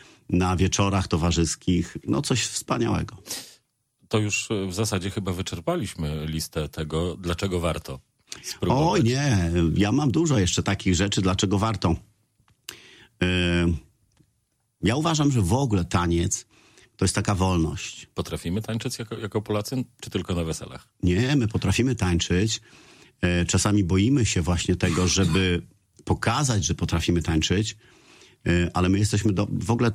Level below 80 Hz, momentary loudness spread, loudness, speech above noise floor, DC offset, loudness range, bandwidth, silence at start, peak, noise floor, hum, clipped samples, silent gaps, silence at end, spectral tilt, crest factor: -40 dBFS; 10 LU; -24 LUFS; 49 dB; under 0.1%; 5 LU; 15 kHz; 0.3 s; -6 dBFS; -72 dBFS; none; under 0.1%; none; 0 s; -5 dB/octave; 18 dB